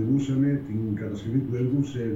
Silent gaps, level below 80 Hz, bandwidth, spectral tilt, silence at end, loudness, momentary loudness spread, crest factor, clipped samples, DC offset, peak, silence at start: none; -54 dBFS; 7.8 kHz; -9 dB/octave; 0 s; -26 LUFS; 6 LU; 12 dB; under 0.1%; under 0.1%; -14 dBFS; 0 s